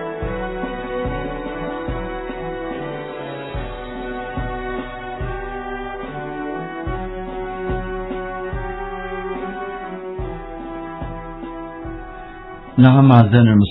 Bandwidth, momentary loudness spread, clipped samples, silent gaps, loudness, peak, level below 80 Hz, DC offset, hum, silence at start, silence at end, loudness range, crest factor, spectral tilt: 4.1 kHz; 19 LU; under 0.1%; none; -22 LUFS; 0 dBFS; -34 dBFS; under 0.1%; none; 0 s; 0 s; 11 LU; 20 dB; -11.5 dB/octave